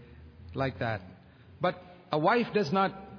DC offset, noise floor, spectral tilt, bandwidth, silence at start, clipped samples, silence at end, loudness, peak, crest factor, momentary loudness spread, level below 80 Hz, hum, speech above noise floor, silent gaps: under 0.1%; -50 dBFS; -7 dB/octave; 5.4 kHz; 0 s; under 0.1%; 0 s; -30 LUFS; -12 dBFS; 20 dB; 12 LU; -60 dBFS; none; 21 dB; none